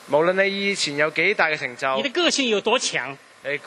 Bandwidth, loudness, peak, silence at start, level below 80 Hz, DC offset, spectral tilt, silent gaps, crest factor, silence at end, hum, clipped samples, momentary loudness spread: 12 kHz; -21 LUFS; -2 dBFS; 0 s; -70 dBFS; under 0.1%; -2.5 dB/octave; none; 20 dB; 0 s; none; under 0.1%; 8 LU